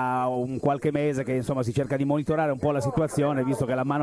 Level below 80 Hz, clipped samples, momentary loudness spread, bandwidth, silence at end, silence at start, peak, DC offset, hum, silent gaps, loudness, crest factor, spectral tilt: -52 dBFS; under 0.1%; 2 LU; 11 kHz; 0 s; 0 s; -10 dBFS; under 0.1%; none; none; -26 LUFS; 14 dB; -7.5 dB/octave